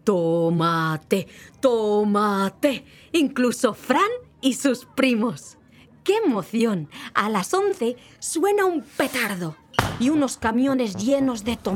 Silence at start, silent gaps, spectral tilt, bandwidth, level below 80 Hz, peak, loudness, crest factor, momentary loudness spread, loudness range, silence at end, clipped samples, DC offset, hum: 0.05 s; none; -5 dB/octave; 18 kHz; -54 dBFS; -2 dBFS; -23 LUFS; 22 dB; 6 LU; 2 LU; 0 s; under 0.1%; under 0.1%; none